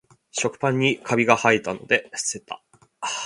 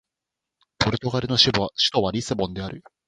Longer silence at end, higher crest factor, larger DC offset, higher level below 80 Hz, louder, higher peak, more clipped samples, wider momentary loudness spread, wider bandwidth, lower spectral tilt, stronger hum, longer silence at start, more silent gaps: second, 0 s vs 0.25 s; about the same, 24 dB vs 22 dB; neither; second, -64 dBFS vs -48 dBFS; about the same, -22 LUFS vs -22 LUFS; about the same, 0 dBFS vs -2 dBFS; neither; first, 15 LU vs 11 LU; about the same, 11.5 kHz vs 11.5 kHz; about the same, -3.5 dB/octave vs -4.5 dB/octave; neither; second, 0.35 s vs 0.8 s; neither